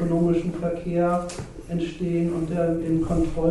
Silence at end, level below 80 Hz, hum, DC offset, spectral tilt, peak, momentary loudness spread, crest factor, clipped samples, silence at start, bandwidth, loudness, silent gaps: 0 s; -38 dBFS; none; under 0.1%; -8 dB/octave; -10 dBFS; 7 LU; 14 dB; under 0.1%; 0 s; 11.5 kHz; -25 LUFS; none